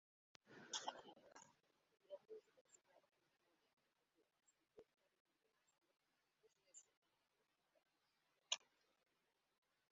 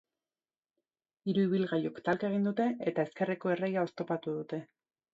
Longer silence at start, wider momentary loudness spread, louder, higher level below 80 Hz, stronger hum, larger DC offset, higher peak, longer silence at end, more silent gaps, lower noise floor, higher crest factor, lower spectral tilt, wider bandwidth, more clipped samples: second, 0.45 s vs 1.25 s; first, 19 LU vs 8 LU; second, -52 LUFS vs -33 LUFS; second, under -90 dBFS vs -78 dBFS; neither; neither; second, -26 dBFS vs -16 dBFS; first, 1.3 s vs 0.5 s; first, 2.61-2.65 s, 3.73-3.77 s, 5.20-5.25 s, 6.97-7.02 s vs none; about the same, -88 dBFS vs under -90 dBFS; first, 36 dB vs 16 dB; second, 1.5 dB/octave vs -8.5 dB/octave; about the same, 7.6 kHz vs 7.6 kHz; neither